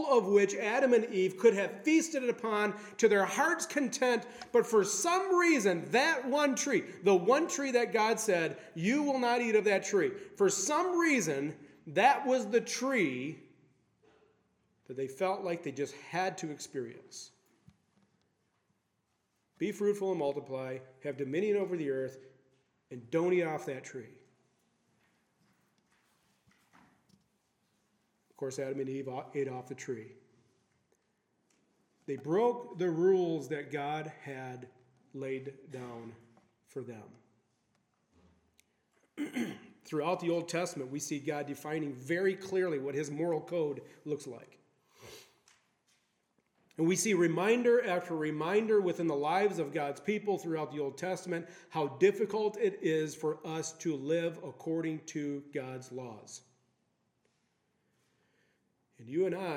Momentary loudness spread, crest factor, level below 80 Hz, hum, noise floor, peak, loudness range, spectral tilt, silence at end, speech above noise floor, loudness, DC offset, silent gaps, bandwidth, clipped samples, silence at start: 16 LU; 22 dB; -86 dBFS; none; -79 dBFS; -12 dBFS; 15 LU; -4.5 dB/octave; 0 s; 47 dB; -32 LUFS; under 0.1%; none; 16.5 kHz; under 0.1%; 0 s